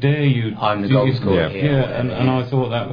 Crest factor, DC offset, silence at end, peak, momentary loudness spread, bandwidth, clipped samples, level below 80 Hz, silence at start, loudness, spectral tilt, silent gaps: 14 dB; under 0.1%; 0 s; -2 dBFS; 4 LU; 5.2 kHz; under 0.1%; -44 dBFS; 0 s; -18 LUFS; -10 dB/octave; none